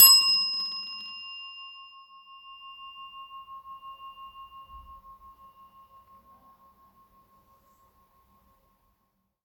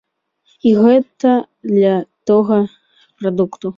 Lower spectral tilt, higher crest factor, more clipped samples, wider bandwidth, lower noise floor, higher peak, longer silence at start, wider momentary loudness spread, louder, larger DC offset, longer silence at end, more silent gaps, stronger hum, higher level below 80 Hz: second, 4 dB/octave vs -8.5 dB/octave; first, 26 dB vs 14 dB; neither; first, 19 kHz vs 7.4 kHz; first, -75 dBFS vs -60 dBFS; about the same, -4 dBFS vs -2 dBFS; second, 0 s vs 0.65 s; first, 26 LU vs 8 LU; second, -22 LUFS vs -15 LUFS; neither; first, 4.65 s vs 0.05 s; neither; neither; second, -66 dBFS vs -60 dBFS